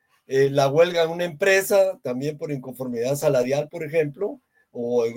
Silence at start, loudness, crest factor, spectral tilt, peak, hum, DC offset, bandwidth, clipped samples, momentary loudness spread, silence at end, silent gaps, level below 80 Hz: 0.3 s; -22 LUFS; 16 dB; -5 dB/octave; -6 dBFS; none; under 0.1%; 17 kHz; under 0.1%; 12 LU; 0 s; none; -66 dBFS